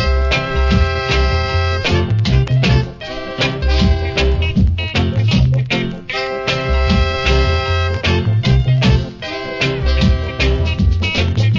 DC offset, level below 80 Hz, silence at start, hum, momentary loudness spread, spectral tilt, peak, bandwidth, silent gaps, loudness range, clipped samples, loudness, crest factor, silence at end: under 0.1%; -20 dBFS; 0 s; none; 5 LU; -6 dB/octave; 0 dBFS; 7.6 kHz; none; 1 LU; under 0.1%; -16 LUFS; 14 dB; 0 s